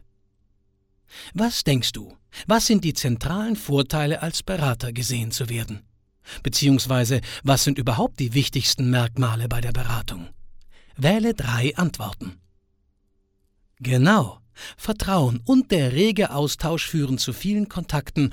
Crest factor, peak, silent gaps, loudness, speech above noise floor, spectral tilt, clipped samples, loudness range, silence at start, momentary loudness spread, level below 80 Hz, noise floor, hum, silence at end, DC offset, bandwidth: 18 dB; -6 dBFS; none; -22 LUFS; 45 dB; -5 dB/octave; under 0.1%; 4 LU; 1.15 s; 14 LU; -40 dBFS; -67 dBFS; none; 0 s; under 0.1%; 18 kHz